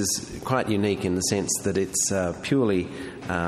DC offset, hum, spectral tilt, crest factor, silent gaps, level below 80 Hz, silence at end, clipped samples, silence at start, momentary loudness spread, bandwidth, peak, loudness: under 0.1%; none; -4 dB/octave; 16 dB; none; -54 dBFS; 0 s; under 0.1%; 0 s; 6 LU; 14 kHz; -8 dBFS; -25 LUFS